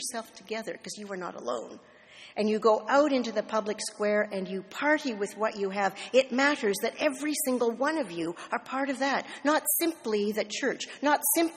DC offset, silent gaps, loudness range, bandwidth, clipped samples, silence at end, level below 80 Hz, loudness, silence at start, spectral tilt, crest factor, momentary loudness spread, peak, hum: under 0.1%; none; 2 LU; 15 kHz; under 0.1%; 0 s; -76 dBFS; -29 LUFS; 0 s; -3 dB/octave; 20 dB; 12 LU; -8 dBFS; none